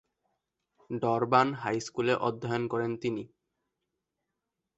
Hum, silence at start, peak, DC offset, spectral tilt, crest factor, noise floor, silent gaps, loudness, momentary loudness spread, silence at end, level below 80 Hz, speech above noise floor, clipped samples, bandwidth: none; 0.9 s; -8 dBFS; under 0.1%; -6 dB/octave; 24 dB; -85 dBFS; none; -30 LUFS; 12 LU; 1.5 s; -70 dBFS; 56 dB; under 0.1%; 8.2 kHz